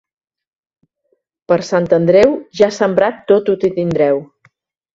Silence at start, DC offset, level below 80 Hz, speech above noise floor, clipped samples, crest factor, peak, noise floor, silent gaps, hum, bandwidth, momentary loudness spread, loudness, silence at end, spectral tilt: 1.5 s; under 0.1%; -52 dBFS; 52 dB; under 0.1%; 16 dB; 0 dBFS; -65 dBFS; none; none; 7.8 kHz; 6 LU; -14 LUFS; 0.7 s; -6.5 dB/octave